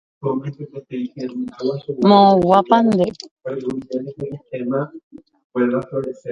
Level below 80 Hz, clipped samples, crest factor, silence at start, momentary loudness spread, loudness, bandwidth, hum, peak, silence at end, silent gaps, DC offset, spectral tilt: -56 dBFS; under 0.1%; 18 dB; 0.2 s; 18 LU; -19 LUFS; 8.4 kHz; none; 0 dBFS; 0 s; 3.31-3.37 s, 5.03-5.11 s, 5.44-5.50 s; under 0.1%; -7.5 dB/octave